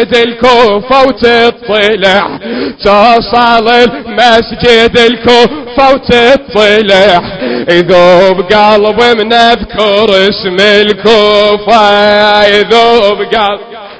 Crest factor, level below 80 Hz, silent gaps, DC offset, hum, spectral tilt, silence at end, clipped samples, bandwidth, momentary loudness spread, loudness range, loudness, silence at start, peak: 6 dB; -34 dBFS; none; under 0.1%; none; -4.5 dB/octave; 0.05 s; 8%; 8 kHz; 5 LU; 1 LU; -6 LUFS; 0 s; 0 dBFS